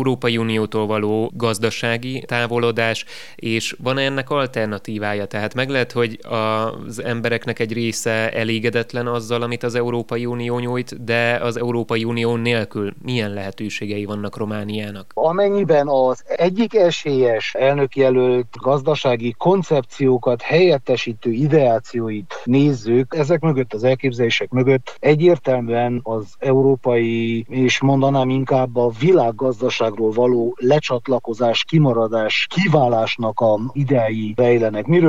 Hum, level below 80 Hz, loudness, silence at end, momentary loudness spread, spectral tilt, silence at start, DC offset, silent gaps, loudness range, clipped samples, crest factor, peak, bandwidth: none; -64 dBFS; -19 LUFS; 0 s; 8 LU; -6 dB/octave; 0 s; 1%; none; 4 LU; under 0.1%; 16 dB; -2 dBFS; 14.5 kHz